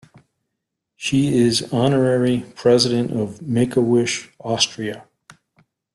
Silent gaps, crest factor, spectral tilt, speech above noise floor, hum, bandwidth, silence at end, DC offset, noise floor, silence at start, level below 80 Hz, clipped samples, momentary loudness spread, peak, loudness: none; 18 dB; -5 dB/octave; 61 dB; none; 12 kHz; 0.95 s; under 0.1%; -79 dBFS; 1 s; -56 dBFS; under 0.1%; 10 LU; -2 dBFS; -19 LUFS